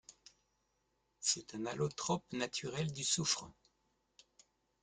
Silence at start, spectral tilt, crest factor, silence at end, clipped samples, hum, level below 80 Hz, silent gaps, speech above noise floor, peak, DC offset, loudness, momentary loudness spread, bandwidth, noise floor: 0.1 s; -3 dB/octave; 22 dB; 1.3 s; under 0.1%; none; -72 dBFS; none; 42 dB; -20 dBFS; under 0.1%; -37 LUFS; 7 LU; 10 kHz; -81 dBFS